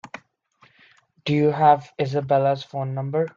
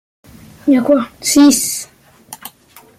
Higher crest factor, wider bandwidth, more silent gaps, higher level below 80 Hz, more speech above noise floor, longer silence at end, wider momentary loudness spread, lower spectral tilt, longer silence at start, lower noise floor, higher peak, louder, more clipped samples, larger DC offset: first, 20 dB vs 14 dB; second, 7.4 kHz vs 16 kHz; neither; second, -64 dBFS vs -52 dBFS; first, 38 dB vs 33 dB; second, 0.1 s vs 0.5 s; second, 15 LU vs 23 LU; first, -8 dB/octave vs -2.5 dB/octave; second, 0.15 s vs 0.65 s; first, -59 dBFS vs -45 dBFS; about the same, -4 dBFS vs -2 dBFS; second, -22 LUFS vs -13 LUFS; neither; neither